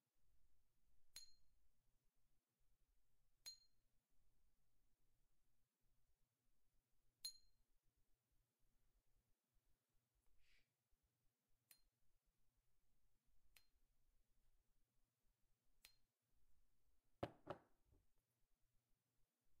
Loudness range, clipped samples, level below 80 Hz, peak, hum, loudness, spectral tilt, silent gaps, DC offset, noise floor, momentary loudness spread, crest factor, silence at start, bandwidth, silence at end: 4 LU; under 0.1%; -84 dBFS; -36 dBFS; none; -59 LUFS; -3 dB/octave; none; under 0.1%; -88 dBFS; 7 LU; 34 dB; 0 s; 6.8 kHz; 0 s